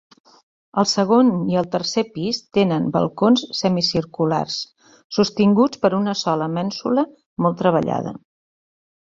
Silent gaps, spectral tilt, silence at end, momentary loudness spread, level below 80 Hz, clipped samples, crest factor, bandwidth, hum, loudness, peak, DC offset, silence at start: 5.04-5.10 s, 7.26-7.36 s; -5.5 dB/octave; 0.85 s; 9 LU; -58 dBFS; under 0.1%; 18 dB; 7.8 kHz; none; -20 LUFS; -2 dBFS; under 0.1%; 0.75 s